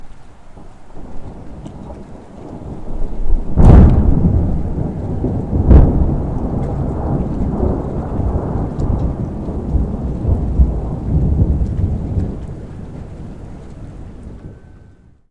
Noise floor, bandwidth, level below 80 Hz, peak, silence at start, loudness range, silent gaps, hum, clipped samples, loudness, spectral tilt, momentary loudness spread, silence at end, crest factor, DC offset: -44 dBFS; 3.9 kHz; -18 dBFS; 0 dBFS; 0 s; 13 LU; none; none; under 0.1%; -17 LUFS; -10.5 dB/octave; 23 LU; 0.5 s; 16 dB; 0.8%